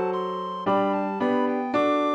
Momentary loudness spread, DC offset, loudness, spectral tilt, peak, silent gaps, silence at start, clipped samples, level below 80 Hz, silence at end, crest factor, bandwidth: 6 LU; under 0.1%; -25 LUFS; -7 dB/octave; -12 dBFS; none; 0 s; under 0.1%; -74 dBFS; 0 s; 12 dB; 8.6 kHz